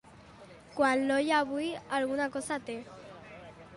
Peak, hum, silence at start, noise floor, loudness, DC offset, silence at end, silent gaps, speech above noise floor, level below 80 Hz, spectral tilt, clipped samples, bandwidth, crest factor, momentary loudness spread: -16 dBFS; none; 0.2 s; -53 dBFS; -30 LUFS; under 0.1%; 0 s; none; 23 dB; -66 dBFS; -4 dB/octave; under 0.1%; 11.5 kHz; 18 dB; 21 LU